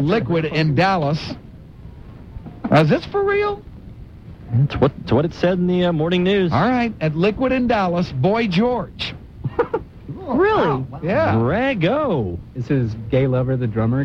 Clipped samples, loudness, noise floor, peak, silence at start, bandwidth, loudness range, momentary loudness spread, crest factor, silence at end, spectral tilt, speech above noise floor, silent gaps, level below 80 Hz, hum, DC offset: under 0.1%; -19 LUFS; -38 dBFS; -2 dBFS; 0 s; 7.6 kHz; 2 LU; 14 LU; 16 dB; 0 s; -8 dB/octave; 20 dB; none; -40 dBFS; none; under 0.1%